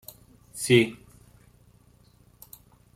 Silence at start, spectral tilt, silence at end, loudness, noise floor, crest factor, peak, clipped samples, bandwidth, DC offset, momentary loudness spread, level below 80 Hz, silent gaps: 0.55 s; -4.5 dB/octave; 2 s; -23 LUFS; -58 dBFS; 24 dB; -6 dBFS; under 0.1%; 16 kHz; under 0.1%; 27 LU; -62 dBFS; none